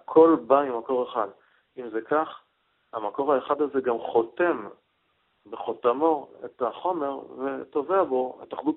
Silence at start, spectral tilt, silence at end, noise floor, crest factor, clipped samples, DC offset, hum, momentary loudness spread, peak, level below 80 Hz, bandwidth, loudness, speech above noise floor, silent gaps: 0.1 s; -4.5 dB/octave; 0 s; -71 dBFS; 20 dB; under 0.1%; under 0.1%; none; 12 LU; -6 dBFS; -72 dBFS; 4 kHz; -26 LUFS; 46 dB; none